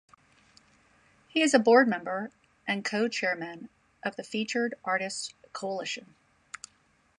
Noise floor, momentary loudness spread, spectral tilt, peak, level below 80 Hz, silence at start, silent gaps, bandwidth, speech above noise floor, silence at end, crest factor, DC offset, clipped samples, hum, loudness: -67 dBFS; 22 LU; -3.5 dB/octave; -8 dBFS; -76 dBFS; 1.35 s; none; 11.5 kHz; 39 dB; 1.15 s; 22 dB; under 0.1%; under 0.1%; none; -28 LUFS